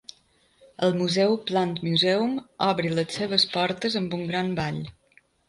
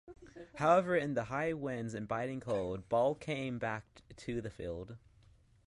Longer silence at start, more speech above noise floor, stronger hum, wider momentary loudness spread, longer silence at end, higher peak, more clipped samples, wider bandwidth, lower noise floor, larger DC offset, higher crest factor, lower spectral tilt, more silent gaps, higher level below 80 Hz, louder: first, 0.8 s vs 0.05 s; first, 38 dB vs 29 dB; neither; second, 7 LU vs 19 LU; about the same, 0.6 s vs 0.7 s; first, -6 dBFS vs -16 dBFS; neither; about the same, 11.5 kHz vs 11.5 kHz; about the same, -62 dBFS vs -64 dBFS; neither; about the same, 20 dB vs 20 dB; second, -5 dB/octave vs -6.5 dB/octave; neither; about the same, -60 dBFS vs -62 dBFS; first, -25 LUFS vs -36 LUFS